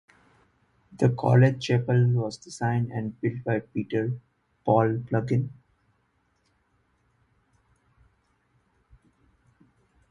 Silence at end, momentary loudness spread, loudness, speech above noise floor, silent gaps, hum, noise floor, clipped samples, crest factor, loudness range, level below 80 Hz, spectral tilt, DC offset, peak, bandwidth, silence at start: 4.6 s; 11 LU; -26 LUFS; 46 dB; none; none; -70 dBFS; under 0.1%; 22 dB; 8 LU; -60 dBFS; -8 dB/octave; under 0.1%; -6 dBFS; 10 kHz; 0.95 s